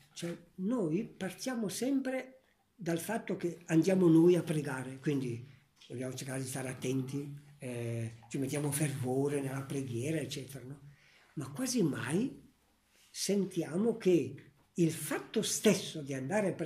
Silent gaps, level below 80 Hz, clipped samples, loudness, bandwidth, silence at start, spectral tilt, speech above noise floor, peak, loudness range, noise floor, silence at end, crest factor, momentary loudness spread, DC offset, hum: none; -74 dBFS; under 0.1%; -34 LUFS; 15.5 kHz; 0.15 s; -5.5 dB/octave; 37 dB; -14 dBFS; 7 LU; -70 dBFS; 0 s; 20 dB; 14 LU; under 0.1%; none